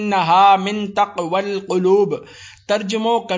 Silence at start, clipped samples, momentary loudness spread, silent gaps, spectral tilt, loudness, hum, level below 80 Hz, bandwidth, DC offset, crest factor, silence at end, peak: 0 s; under 0.1%; 10 LU; none; -5 dB/octave; -17 LUFS; none; -60 dBFS; 7.6 kHz; under 0.1%; 14 dB; 0 s; -2 dBFS